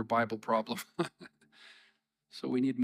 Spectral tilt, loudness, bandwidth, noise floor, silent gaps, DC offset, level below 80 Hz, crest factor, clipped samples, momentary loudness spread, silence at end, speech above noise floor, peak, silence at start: -5.5 dB/octave; -34 LUFS; 15.5 kHz; -71 dBFS; none; under 0.1%; -84 dBFS; 18 dB; under 0.1%; 24 LU; 0 s; 38 dB; -16 dBFS; 0 s